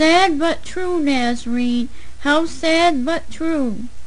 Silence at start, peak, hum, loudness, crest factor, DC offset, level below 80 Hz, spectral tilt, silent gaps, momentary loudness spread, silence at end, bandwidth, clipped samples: 0 s; -2 dBFS; none; -19 LUFS; 16 dB; 6%; -42 dBFS; -3.5 dB/octave; none; 9 LU; 0 s; 10 kHz; under 0.1%